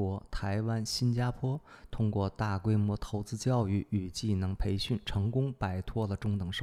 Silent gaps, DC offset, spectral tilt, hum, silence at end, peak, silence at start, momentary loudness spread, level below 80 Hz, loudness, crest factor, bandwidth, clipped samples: none; under 0.1%; -6.5 dB/octave; none; 0 s; -18 dBFS; 0 s; 6 LU; -46 dBFS; -33 LUFS; 14 dB; 14 kHz; under 0.1%